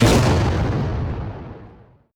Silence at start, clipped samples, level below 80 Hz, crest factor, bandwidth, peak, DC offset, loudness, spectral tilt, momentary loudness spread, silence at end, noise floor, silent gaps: 0 s; under 0.1%; -30 dBFS; 16 dB; 19.5 kHz; -4 dBFS; under 0.1%; -20 LUFS; -6 dB/octave; 21 LU; 0.45 s; -47 dBFS; none